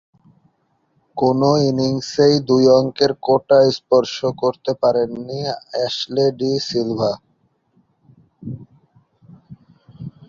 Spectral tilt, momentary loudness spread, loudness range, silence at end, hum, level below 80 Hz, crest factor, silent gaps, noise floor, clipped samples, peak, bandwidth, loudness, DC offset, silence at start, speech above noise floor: -6 dB/octave; 20 LU; 10 LU; 0.2 s; none; -56 dBFS; 18 dB; none; -65 dBFS; under 0.1%; -2 dBFS; 7.6 kHz; -17 LUFS; under 0.1%; 1.15 s; 48 dB